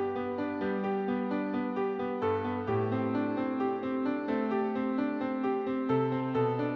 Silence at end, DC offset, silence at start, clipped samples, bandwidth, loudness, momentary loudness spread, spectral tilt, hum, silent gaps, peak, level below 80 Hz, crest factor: 0 s; under 0.1%; 0 s; under 0.1%; 5.8 kHz; -31 LUFS; 3 LU; -9.5 dB/octave; none; none; -16 dBFS; -68 dBFS; 14 dB